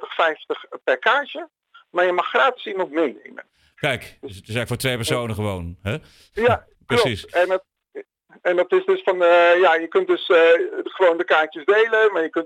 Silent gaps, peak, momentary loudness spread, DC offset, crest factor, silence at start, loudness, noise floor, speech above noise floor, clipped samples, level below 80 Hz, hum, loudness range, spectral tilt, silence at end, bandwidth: none; -4 dBFS; 14 LU; under 0.1%; 18 dB; 0 s; -20 LUFS; -40 dBFS; 21 dB; under 0.1%; -56 dBFS; none; 8 LU; -5 dB/octave; 0 s; 15.5 kHz